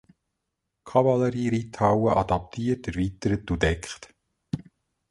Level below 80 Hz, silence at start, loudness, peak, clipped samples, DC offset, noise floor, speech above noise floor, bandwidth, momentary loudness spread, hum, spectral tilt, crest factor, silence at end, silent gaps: -42 dBFS; 0.85 s; -25 LUFS; -6 dBFS; under 0.1%; under 0.1%; -81 dBFS; 57 dB; 11.5 kHz; 14 LU; none; -7 dB/octave; 20 dB; 0.5 s; none